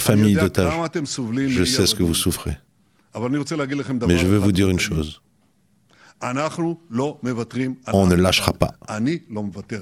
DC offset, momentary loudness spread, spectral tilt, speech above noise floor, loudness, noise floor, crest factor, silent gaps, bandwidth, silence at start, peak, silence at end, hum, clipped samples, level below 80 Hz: under 0.1%; 12 LU; -5 dB/octave; 41 dB; -21 LUFS; -61 dBFS; 20 dB; none; 16 kHz; 0 s; 0 dBFS; 0 s; none; under 0.1%; -44 dBFS